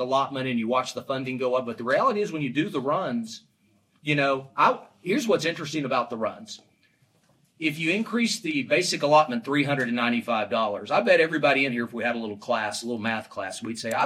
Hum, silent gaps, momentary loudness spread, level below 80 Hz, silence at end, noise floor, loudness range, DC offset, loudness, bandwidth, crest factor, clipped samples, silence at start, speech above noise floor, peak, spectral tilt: none; none; 11 LU; -74 dBFS; 0 s; -65 dBFS; 5 LU; under 0.1%; -25 LUFS; 15 kHz; 18 dB; under 0.1%; 0 s; 40 dB; -6 dBFS; -4.5 dB/octave